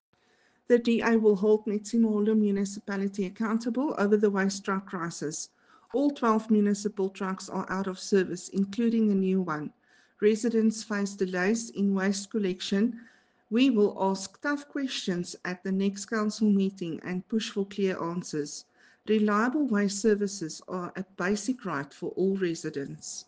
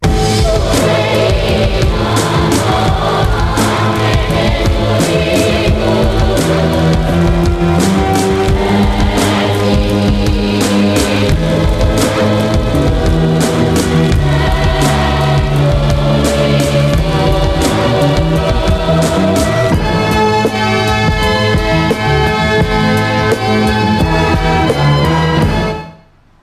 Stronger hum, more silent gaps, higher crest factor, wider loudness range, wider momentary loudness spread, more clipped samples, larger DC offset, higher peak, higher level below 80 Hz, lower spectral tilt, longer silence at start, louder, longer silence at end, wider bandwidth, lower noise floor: neither; neither; first, 18 dB vs 10 dB; about the same, 3 LU vs 1 LU; first, 11 LU vs 1 LU; neither; neither; second, -10 dBFS vs -2 dBFS; second, -70 dBFS vs -20 dBFS; about the same, -5.5 dB/octave vs -5.5 dB/octave; first, 0.7 s vs 0 s; second, -28 LUFS vs -12 LUFS; second, 0.05 s vs 0.5 s; second, 9.8 kHz vs 14.5 kHz; first, -67 dBFS vs -43 dBFS